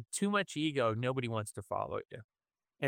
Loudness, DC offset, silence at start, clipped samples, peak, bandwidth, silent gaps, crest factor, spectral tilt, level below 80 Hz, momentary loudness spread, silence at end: -35 LUFS; under 0.1%; 0 s; under 0.1%; -18 dBFS; 17 kHz; 2.24-2.29 s; 18 dB; -5 dB/octave; -70 dBFS; 10 LU; 0 s